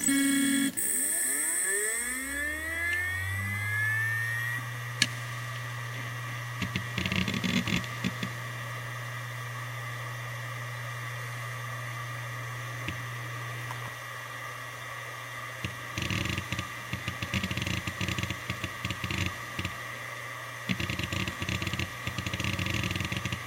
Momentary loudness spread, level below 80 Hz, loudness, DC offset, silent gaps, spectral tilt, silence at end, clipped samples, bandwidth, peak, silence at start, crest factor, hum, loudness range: 11 LU; -54 dBFS; -32 LUFS; under 0.1%; none; -3 dB/octave; 0 s; under 0.1%; 17 kHz; -4 dBFS; 0 s; 28 dB; none; 8 LU